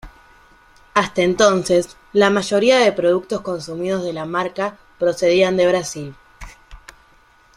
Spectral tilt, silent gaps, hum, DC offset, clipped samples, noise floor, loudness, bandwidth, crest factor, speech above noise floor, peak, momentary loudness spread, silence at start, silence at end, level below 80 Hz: -4.5 dB/octave; none; none; under 0.1%; under 0.1%; -52 dBFS; -18 LUFS; 13.5 kHz; 18 dB; 35 dB; -2 dBFS; 11 LU; 0.05 s; 0.8 s; -48 dBFS